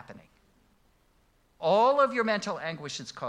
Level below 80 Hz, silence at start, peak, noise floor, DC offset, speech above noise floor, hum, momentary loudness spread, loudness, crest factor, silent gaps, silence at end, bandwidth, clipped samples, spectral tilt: -70 dBFS; 0.1 s; -12 dBFS; -66 dBFS; under 0.1%; 39 dB; none; 13 LU; -27 LUFS; 18 dB; none; 0 s; 10.5 kHz; under 0.1%; -4.5 dB/octave